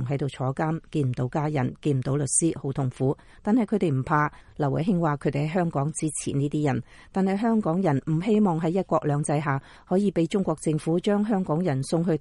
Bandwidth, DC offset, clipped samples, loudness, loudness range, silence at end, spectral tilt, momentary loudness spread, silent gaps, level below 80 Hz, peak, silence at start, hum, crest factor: 11.5 kHz; under 0.1%; under 0.1%; -25 LUFS; 2 LU; 0 s; -6.5 dB/octave; 5 LU; none; -54 dBFS; -10 dBFS; 0 s; none; 14 dB